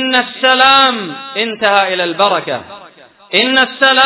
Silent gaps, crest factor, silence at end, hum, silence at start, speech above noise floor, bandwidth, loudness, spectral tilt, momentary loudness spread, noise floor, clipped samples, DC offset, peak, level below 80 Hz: none; 12 dB; 0 s; none; 0 s; 28 dB; 4 kHz; -11 LUFS; -6.5 dB/octave; 13 LU; -40 dBFS; 0.7%; under 0.1%; 0 dBFS; -58 dBFS